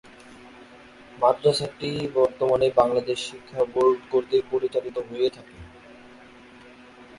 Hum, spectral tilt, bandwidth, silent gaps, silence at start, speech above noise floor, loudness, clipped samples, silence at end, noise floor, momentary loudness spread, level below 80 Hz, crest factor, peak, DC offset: none; -5.5 dB/octave; 11.5 kHz; none; 0.3 s; 25 dB; -24 LUFS; under 0.1%; 0.15 s; -48 dBFS; 9 LU; -58 dBFS; 20 dB; -4 dBFS; under 0.1%